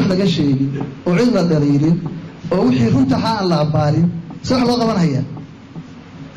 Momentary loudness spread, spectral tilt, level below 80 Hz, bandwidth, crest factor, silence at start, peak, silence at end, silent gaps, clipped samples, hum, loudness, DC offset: 19 LU; -7.5 dB/octave; -44 dBFS; 9.4 kHz; 8 dB; 0 s; -8 dBFS; 0 s; none; under 0.1%; none; -16 LUFS; under 0.1%